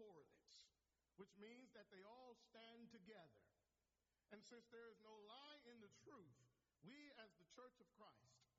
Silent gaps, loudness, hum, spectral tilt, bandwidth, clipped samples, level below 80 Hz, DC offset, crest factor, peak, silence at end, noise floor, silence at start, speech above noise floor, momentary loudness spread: none; -66 LUFS; none; -3 dB/octave; 7.4 kHz; under 0.1%; under -90 dBFS; under 0.1%; 18 dB; -48 dBFS; 0 s; under -90 dBFS; 0 s; over 24 dB; 4 LU